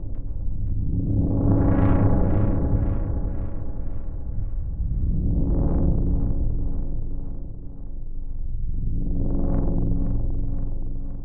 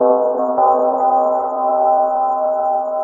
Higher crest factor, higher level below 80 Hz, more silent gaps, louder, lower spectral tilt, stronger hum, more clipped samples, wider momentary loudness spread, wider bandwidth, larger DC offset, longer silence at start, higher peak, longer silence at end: about the same, 14 dB vs 12 dB; first, -24 dBFS vs -64 dBFS; neither; second, -26 LUFS vs -16 LUFS; first, -12 dB/octave vs -9 dB/octave; neither; neither; first, 14 LU vs 4 LU; first, 2.4 kHz vs 1.8 kHz; neither; about the same, 0 s vs 0 s; about the same, -6 dBFS vs -4 dBFS; about the same, 0 s vs 0 s